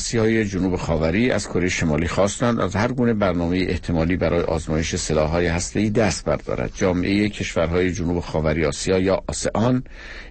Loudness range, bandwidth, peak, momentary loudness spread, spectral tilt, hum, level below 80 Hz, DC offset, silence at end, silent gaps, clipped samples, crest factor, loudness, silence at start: 1 LU; 8.8 kHz; -8 dBFS; 4 LU; -5.5 dB/octave; none; -36 dBFS; under 0.1%; 0 s; none; under 0.1%; 14 dB; -21 LUFS; 0 s